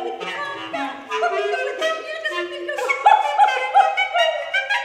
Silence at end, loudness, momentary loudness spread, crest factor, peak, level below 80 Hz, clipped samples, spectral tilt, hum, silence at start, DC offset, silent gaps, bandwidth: 0 s; -20 LUFS; 12 LU; 20 dB; -2 dBFS; -74 dBFS; under 0.1%; -1.5 dB/octave; none; 0 s; under 0.1%; none; 13.5 kHz